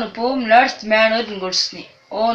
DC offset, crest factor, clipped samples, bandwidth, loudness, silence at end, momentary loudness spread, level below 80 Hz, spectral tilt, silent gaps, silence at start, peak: under 0.1%; 18 dB; under 0.1%; 8.4 kHz; -17 LUFS; 0 s; 10 LU; -56 dBFS; -2.5 dB/octave; none; 0 s; 0 dBFS